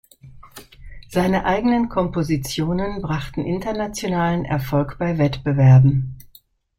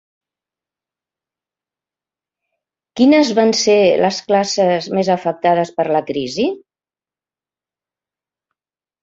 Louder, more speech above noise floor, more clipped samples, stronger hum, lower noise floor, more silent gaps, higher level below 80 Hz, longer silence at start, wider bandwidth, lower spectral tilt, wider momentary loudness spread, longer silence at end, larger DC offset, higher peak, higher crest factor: second, -20 LUFS vs -15 LUFS; second, 34 dB vs over 75 dB; neither; neither; second, -53 dBFS vs under -90 dBFS; neither; first, -40 dBFS vs -62 dBFS; second, 0.25 s vs 2.95 s; first, 15.5 kHz vs 7.8 kHz; first, -7 dB/octave vs -4.5 dB/octave; first, 12 LU vs 8 LU; second, 0.55 s vs 2.45 s; neither; about the same, -4 dBFS vs -2 dBFS; about the same, 16 dB vs 16 dB